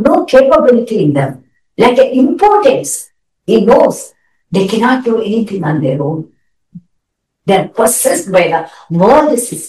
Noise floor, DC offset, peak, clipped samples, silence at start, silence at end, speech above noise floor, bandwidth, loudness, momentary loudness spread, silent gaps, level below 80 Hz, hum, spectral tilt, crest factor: -69 dBFS; 0.1%; 0 dBFS; 0.7%; 0 s; 0 s; 59 dB; 13 kHz; -11 LUFS; 12 LU; none; -46 dBFS; none; -5 dB/octave; 12 dB